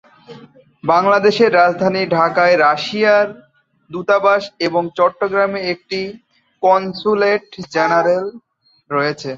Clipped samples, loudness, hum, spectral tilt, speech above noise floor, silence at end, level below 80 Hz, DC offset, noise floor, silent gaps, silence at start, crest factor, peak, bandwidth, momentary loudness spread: under 0.1%; -15 LUFS; none; -5.5 dB/octave; 28 dB; 0 s; -62 dBFS; under 0.1%; -43 dBFS; none; 0.3 s; 16 dB; -2 dBFS; 7.8 kHz; 11 LU